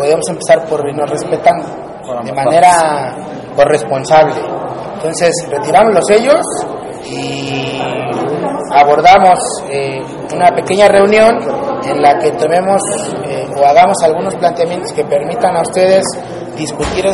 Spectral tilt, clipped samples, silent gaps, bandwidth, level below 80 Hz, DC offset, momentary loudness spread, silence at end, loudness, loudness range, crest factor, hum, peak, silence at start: -4 dB/octave; 0.3%; none; 11.5 kHz; -42 dBFS; under 0.1%; 14 LU; 0 s; -11 LUFS; 3 LU; 12 dB; none; 0 dBFS; 0 s